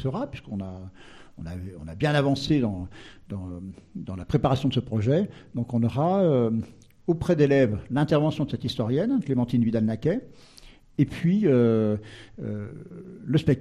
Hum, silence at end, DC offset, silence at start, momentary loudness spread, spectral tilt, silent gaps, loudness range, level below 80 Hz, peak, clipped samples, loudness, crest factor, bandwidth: none; 0 s; under 0.1%; 0 s; 18 LU; -8 dB/octave; none; 5 LU; -50 dBFS; -8 dBFS; under 0.1%; -25 LUFS; 16 dB; 11.5 kHz